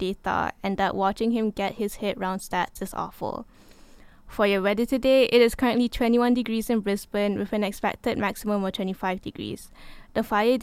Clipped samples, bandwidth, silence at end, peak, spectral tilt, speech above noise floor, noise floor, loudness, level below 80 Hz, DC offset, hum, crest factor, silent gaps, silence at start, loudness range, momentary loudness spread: under 0.1%; 16 kHz; 0 s; -6 dBFS; -5.5 dB/octave; 25 dB; -49 dBFS; -25 LUFS; -48 dBFS; under 0.1%; none; 18 dB; none; 0 s; 6 LU; 12 LU